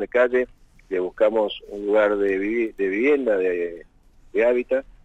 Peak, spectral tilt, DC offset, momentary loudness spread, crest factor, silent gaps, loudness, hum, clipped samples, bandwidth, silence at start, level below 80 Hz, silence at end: -6 dBFS; -6 dB/octave; under 0.1%; 10 LU; 16 dB; none; -22 LUFS; none; under 0.1%; 8 kHz; 0 s; -52 dBFS; 0.15 s